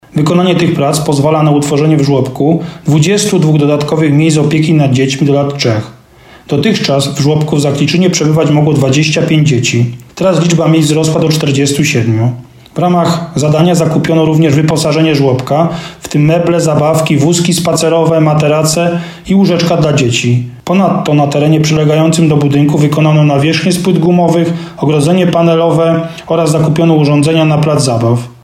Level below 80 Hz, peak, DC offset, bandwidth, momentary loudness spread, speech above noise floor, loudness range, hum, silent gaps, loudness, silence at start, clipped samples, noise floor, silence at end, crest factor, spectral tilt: -44 dBFS; 0 dBFS; under 0.1%; 14.5 kHz; 4 LU; 29 dB; 2 LU; none; none; -10 LUFS; 0.15 s; under 0.1%; -38 dBFS; 0.1 s; 10 dB; -6 dB/octave